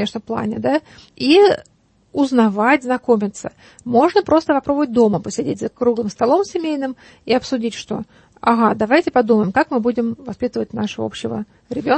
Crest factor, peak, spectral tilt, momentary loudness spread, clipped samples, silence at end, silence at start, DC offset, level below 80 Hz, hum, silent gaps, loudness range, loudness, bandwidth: 16 dB; -2 dBFS; -5.5 dB/octave; 12 LU; under 0.1%; 0 s; 0 s; under 0.1%; -54 dBFS; none; none; 3 LU; -18 LUFS; 8.8 kHz